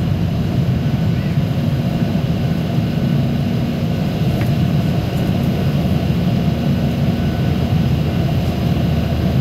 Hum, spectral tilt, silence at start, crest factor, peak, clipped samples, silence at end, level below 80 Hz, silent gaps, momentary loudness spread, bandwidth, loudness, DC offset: none; -8 dB/octave; 0 s; 12 dB; -4 dBFS; under 0.1%; 0 s; -32 dBFS; none; 2 LU; 15.5 kHz; -18 LUFS; under 0.1%